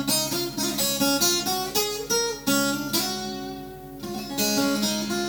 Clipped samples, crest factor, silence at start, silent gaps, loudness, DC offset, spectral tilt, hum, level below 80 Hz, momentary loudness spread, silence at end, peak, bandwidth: under 0.1%; 18 dB; 0 s; none; -24 LUFS; under 0.1%; -2.5 dB/octave; none; -52 dBFS; 13 LU; 0 s; -8 dBFS; over 20 kHz